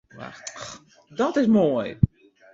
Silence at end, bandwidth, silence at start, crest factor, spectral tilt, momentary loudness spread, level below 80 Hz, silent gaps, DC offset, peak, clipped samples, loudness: 0.5 s; 7.6 kHz; 0.15 s; 22 dB; -7 dB/octave; 20 LU; -44 dBFS; none; under 0.1%; -2 dBFS; under 0.1%; -22 LUFS